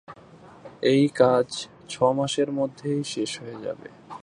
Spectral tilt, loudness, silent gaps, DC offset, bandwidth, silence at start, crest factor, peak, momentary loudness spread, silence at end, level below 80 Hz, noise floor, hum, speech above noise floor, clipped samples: -5.5 dB/octave; -24 LUFS; none; under 0.1%; 11 kHz; 0.1 s; 20 dB; -4 dBFS; 15 LU; 0.05 s; -66 dBFS; -49 dBFS; none; 25 dB; under 0.1%